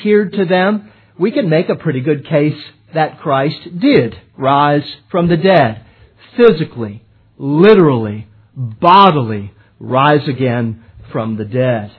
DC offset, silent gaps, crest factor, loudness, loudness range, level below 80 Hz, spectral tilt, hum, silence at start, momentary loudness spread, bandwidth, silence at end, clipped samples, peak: under 0.1%; none; 14 dB; -13 LUFS; 4 LU; -50 dBFS; -10 dB/octave; none; 0 s; 17 LU; 5.4 kHz; 0.1 s; 0.1%; 0 dBFS